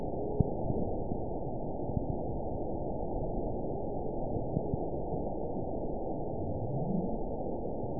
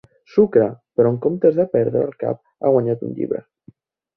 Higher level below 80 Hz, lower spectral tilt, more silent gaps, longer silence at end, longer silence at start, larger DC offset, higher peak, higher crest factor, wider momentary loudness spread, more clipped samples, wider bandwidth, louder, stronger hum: first, -42 dBFS vs -60 dBFS; second, -4.5 dB/octave vs -11.5 dB/octave; neither; second, 0 s vs 0.75 s; second, 0 s vs 0.35 s; first, 1% vs under 0.1%; second, -10 dBFS vs -2 dBFS; first, 24 dB vs 16 dB; second, 4 LU vs 9 LU; neither; second, 1 kHz vs 5.6 kHz; second, -36 LUFS vs -19 LUFS; neither